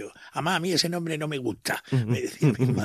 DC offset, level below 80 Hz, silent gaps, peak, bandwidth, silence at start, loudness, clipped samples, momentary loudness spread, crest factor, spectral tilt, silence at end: under 0.1%; -64 dBFS; none; -8 dBFS; 15 kHz; 0 s; -26 LUFS; under 0.1%; 7 LU; 18 dB; -5 dB/octave; 0 s